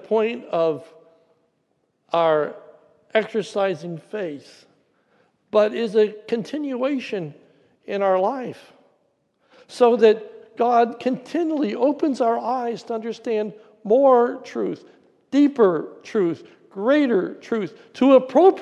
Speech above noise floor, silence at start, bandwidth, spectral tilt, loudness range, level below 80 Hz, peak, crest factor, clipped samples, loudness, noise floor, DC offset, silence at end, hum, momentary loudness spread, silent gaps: 49 dB; 0.05 s; 10 kHz; -6.5 dB/octave; 5 LU; -74 dBFS; -2 dBFS; 18 dB; under 0.1%; -21 LUFS; -69 dBFS; under 0.1%; 0 s; none; 15 LU; none